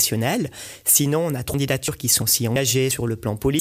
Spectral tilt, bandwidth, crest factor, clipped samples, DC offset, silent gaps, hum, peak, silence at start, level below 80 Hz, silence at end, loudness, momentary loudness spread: -3.5 dB/octave; 16 kHz; 16 dB; under 0.1%; under 0.1%; none; none; -6 dBFS; 0 s; -46 dBFS; 0 s; -20 LUFS; 8 LU